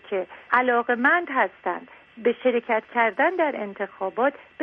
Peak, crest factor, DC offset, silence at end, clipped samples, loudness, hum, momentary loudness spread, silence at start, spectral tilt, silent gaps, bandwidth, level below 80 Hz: -4 dBFS; 20 dB; under 0.1%; 0 s; under 0.1%; -23 LUFS; none; 11 LU; 0.05 s; -7 dB/octave; none; 5 kHz; -72 dBFS